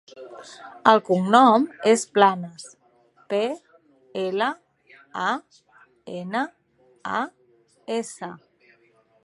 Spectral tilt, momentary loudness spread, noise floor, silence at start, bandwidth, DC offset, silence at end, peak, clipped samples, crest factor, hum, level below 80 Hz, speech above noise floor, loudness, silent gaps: -4.5 dB/octave; 24 LU; -61 dBFS; 0.15 s; 11.5 kHz; under 0.1%; 0.9 s; -2 dBFS; under 0.1%; 24 dB; none; -76 dBFS; 39 dB; -22 LUFS; none